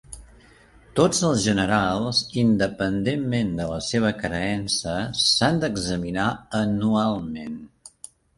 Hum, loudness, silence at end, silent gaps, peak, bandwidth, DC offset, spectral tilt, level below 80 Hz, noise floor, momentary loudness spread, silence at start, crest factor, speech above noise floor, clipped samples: none; -23 LUFS; 0.5 s; none; -6 dBFS; 11.5 kHz; under 0.1%; -4.5 dB/octave; -46 dBFS; -52 dBFS; 12 LU; 0.1 s; 18 dB; 29 dB; under 0.1%